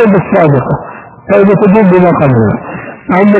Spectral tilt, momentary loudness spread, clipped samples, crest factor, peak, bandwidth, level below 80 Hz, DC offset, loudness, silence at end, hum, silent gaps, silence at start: -12.5 dB/octave; 17 LU; 2%; 8 dB; 0 dBFS; 4 kHz; -38 dBFS; under 0.1%; -8 LUFS; 0 s; none; none; 0 s